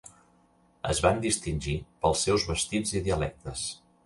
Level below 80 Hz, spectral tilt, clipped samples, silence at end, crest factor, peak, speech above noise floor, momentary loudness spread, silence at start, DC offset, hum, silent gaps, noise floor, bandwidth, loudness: -42 dBFS; -4 dB/octave; under 0.1%; 0.3 s; 22 dB; -8 dBFS; 35 dB; 10 LU; 0.05 s; under 0.1%; none; none; -63 dBFS; 11.5 kHz; -28 LUFS